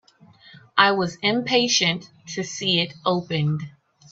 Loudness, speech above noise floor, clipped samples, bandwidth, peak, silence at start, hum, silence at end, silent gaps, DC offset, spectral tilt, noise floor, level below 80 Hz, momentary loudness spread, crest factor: -21 LUFS; 29 dB; under 0.1%; 8 kHz; 0 dBFS; 0.55 s; none; 0.4 s; none; under 0.1%; -3.5 dB/octave; -52 dBFS; -64 dBFS; 13 LU; 22 dB